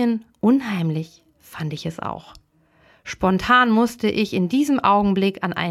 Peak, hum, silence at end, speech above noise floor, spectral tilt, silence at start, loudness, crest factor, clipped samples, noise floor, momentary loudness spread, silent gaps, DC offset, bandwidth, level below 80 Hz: -4 dBFS; none; 0 s; 38 dB; -6 dB/octave; 0 s; -20 LUFS; 18 dB; under 0.1%; -58 dBFS; 17 LU; none; under 0.1%; 14 kHz; -50 dBFS